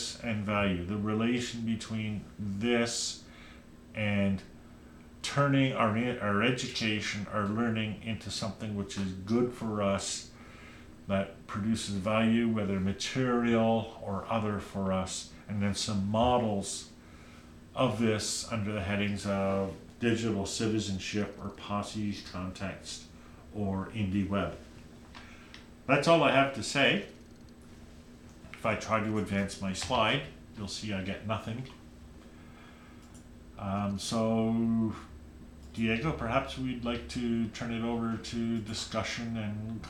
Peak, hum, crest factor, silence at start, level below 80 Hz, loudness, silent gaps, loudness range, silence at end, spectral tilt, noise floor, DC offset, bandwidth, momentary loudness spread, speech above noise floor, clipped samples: -10 dBFS; none; 22 dB; 0 s; -54 dBFS; -31 LUFS; none; 6 LU; 0 s; -5 dB/octave; -52 dBFS; under 0.1%; 13.5 kHz; 23 LU; 21 dB; under 0.1%